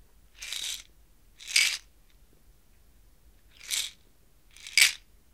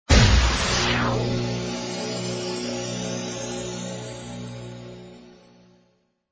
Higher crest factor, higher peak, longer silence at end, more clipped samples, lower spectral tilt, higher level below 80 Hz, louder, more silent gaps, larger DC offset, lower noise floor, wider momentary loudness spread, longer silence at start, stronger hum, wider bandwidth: first, 32 dB vs 22 dB; about the same, -2 dBFS vs -4 dBFS; second, 0.35 s vs 1 s; neither; second, 3.5 dB/octave vs -4 dB/octave; second, -62 dBFS vs -30 dBFS; about the same, -26 LUFS vs -24 LUFS; neither; neither; second, -62 dBFS vs -66 dBFS; first, 23 LU vs 18 LU; first, 0.4 s vs 0.1 s; second, none vs 60 Hz at -40 dBFS; first, 17.5 kHz vs 8 kHz